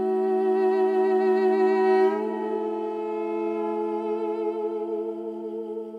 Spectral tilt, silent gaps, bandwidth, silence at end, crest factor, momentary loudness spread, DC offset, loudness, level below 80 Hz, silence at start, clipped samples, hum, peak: -7.5 dB/octave; none; 5 kHz; 0 s; 12 dB; 10 LU; under 0.1%; -25 LUFS; -82 dBFS; 0 s; under 0.1%; none; -12 dBFS